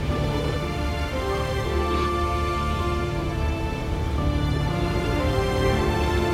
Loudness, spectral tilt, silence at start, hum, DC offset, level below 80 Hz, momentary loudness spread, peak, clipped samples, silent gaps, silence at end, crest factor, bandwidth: -25 LUFS; -6.5 dB/octave; 0 s; none; under 0.1%; -28 dBFS; 4 LU; -10 dBFS; under 0.1%; none; 0 s; 14 dB; 15.5 kHz